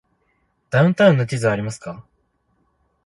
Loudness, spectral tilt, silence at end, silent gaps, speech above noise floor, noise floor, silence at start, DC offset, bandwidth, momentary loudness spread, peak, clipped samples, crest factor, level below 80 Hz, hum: -18 LUFS; -7 dB/octave; 1.05 s; none; 49 dB; -66 dBFS; 0.7 s; under 0.1%; 11.5 kHz; 20 LU; -2 dBFS; under 0.1%; 20 dB; -56 dBFS; none